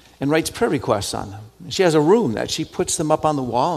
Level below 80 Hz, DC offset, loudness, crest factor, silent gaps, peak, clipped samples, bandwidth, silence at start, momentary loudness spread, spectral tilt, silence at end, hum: -48 dBFS; under 0.1%; -20 LUFS; 18 dB; none; -2 dBFS; under 0.1%; 14.5 kHz; 0.2 s; 11 LU; -4.5 dB/octave; 0 s; none